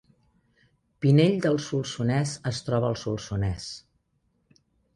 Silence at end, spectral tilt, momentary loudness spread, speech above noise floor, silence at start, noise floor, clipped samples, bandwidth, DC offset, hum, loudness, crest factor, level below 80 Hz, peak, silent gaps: 1.2 s; -6.5 dB/octave; 11 LU; 47 dB; 1 s; -71 dBFS; under 0.1%; 11 kHz; under 0.1%; none; -26 LUFS; 20 dB; -50 dBFS; -8 dBFS; none